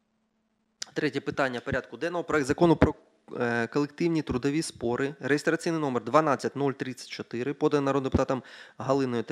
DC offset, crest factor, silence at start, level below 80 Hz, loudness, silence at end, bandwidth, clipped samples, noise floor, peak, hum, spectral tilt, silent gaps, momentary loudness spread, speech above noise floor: under 0.1%; 26 dB; 0.95 s; -50 dBFS; -28 LUFS; 0 s; 13.5 kHz; under 0.1%; -74 dBFS; -2 dBFS; none; -6 dB/octave; none; 12 LU; 46 dB